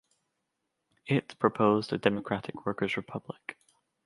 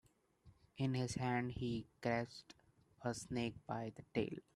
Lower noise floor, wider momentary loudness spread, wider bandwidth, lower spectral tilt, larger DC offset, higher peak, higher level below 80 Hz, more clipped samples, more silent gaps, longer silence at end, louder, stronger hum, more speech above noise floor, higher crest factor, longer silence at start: first, -82 dBFS vs -69 dBFS; first, 16 LU vs 7 LU; about the same, 11.5 kHz vs 12.5 kHz; about the same, -7 dB/octave vs -6 dB/octave; neither; first, -8 dBFS vs -24 dBFS; about the same, -68 dBFS vs -68 dBFS; neither; neither; first, 0.55 s vs 0.15 s; first, -30 LUFS vs -43 LUFS; neither; first, 53 dB vs 27 dB; about the same, 24 dB vs 20 dB; first, 1.05 s vs 0.45 s